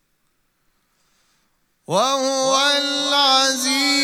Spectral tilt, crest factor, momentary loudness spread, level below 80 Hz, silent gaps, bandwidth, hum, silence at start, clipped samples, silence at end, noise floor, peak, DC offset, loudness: -1 dB/octave; 18 dB; 5 LU; -74 dBFS; none; 16.5 kHz; none; 1.9 s; under 0.1%; 0 s; -67 dBFS; -2 dBFS; under 0.1%; -17 LUFS